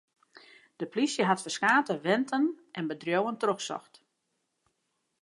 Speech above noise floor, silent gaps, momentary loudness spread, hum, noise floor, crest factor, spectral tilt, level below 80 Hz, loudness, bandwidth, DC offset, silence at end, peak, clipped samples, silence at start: 51 dB; none; 12 LU; none; -80 dBFS; 20 dB; -4 dB/octave; -84 dBFS; -29 LUFS; 11.5 kHz; under 0.1%; 1.4 s; -10 dBFS; under 0.1%; 0.8 s